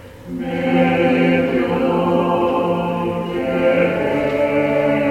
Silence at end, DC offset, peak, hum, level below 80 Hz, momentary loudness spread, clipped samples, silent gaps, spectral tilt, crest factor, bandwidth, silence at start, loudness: 0 s; under 0.1%; -4 dBFS; none; -46 dBFS; 7 LU; under 0.1%; none; -7.5 dB/octave; 14 dB; 15 kHz; 0 s; -17 LUFS